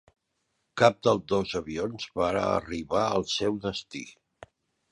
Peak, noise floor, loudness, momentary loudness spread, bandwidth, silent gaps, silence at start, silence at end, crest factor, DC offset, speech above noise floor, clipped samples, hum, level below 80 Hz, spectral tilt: -4 dBFS; -77 dBFS; -27 LUFS; 15 LU; 11.5 kHz; none; 0.75 s; 0.8 s; 24 dB; under 0.1%; 50 dB; under 0.1%; none; -56 dBFS; -5 dB/octave